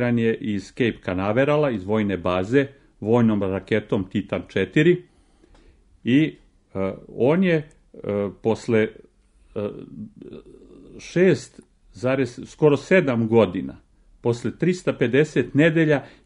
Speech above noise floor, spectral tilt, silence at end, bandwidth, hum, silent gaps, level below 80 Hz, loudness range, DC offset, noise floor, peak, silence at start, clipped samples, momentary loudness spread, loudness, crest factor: 34 dB; -7 dB/octave; 0.2 s; 10.5 kHz; none; none; -54 dBFS; 5 LU; under 0.1%; -55 dBFS; -4 dBFS; 0 s; under 0.1%; 13 LU; -22 LUFS; 18 dB